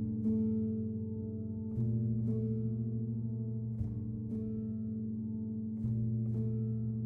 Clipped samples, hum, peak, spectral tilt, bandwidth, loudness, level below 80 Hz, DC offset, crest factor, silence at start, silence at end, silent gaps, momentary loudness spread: under 0.1%; none; -24 dBFS; -14 dB/octave; 1.4 kHz; -36 LUFS; -56 dBFS; under 0.1%; 12 dB; 0 s; 0 s; none; 5 LU